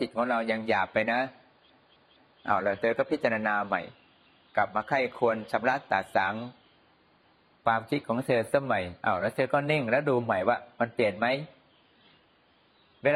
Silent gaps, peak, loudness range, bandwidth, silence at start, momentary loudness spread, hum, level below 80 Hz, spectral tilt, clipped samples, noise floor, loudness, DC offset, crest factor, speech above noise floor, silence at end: none; -8 dBFS; 3 LU; 13 kHz; 0 s; 6 LU; none; -70 dBFS; -6.5 dB/octave; under 0.1%; -64 dBFS; -28 LUFS; under 0.1%; 20 dB; 36 dB; 0 s